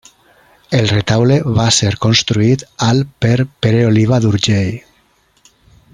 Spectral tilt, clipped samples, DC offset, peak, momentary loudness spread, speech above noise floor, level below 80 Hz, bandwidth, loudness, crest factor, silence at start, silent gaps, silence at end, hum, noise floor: -5 dB/octave; under 0.1%; under 0.1%; 0 dBFS; 4 LU; 43 dB; -44 dBFS; 11 kHz; -13 LUFS; 14 dB; 0.7 s; none; 1.15 s; none; -55 dBFS